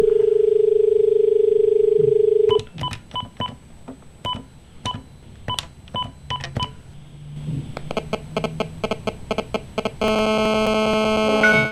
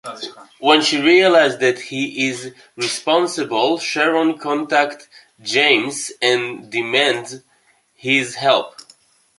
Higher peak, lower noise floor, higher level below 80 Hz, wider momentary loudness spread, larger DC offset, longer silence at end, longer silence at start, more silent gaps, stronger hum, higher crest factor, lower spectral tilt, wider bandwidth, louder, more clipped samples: about the same, -4 dBFS vs -2 dBFS; second, -41 dBFS vs -59 dBFS; first, -44 dBFS vs -68 dBFS; second, 14 LU vs 17 LU; first, 0.2% vs under 0.1%; second, 0 s vs 0.7 s; about the same, 0 s vs 0.05 s; neither; neither; about the same, 18 dB vs 18 dB; first, -5 dB/octave vs -3 dB/octave; about the same, 12.5 kHz vs 11.5 kHz; second, -21 LUFS vs -17 LUFS; neither